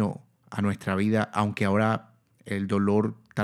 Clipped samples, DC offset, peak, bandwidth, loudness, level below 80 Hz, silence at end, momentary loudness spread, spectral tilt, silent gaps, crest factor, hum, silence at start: under 0.1%; under 0.1%; -8 dBFS; 12 kHz; -27 LUFS; -68 dBFS; 0 s; 9 LU; -7.5 dB/octave; none; 18 dB; none; 0 s